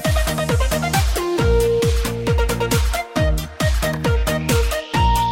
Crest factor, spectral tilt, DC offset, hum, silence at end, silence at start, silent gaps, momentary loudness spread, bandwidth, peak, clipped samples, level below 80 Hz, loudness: 12 dB; -5 dB/octave; under 0.1%; none; 0 s; 0 s; none; 4 LU; 16.5 kHz; -6 dBFS; under 0.1%; -22 dBFS; -19 LUFS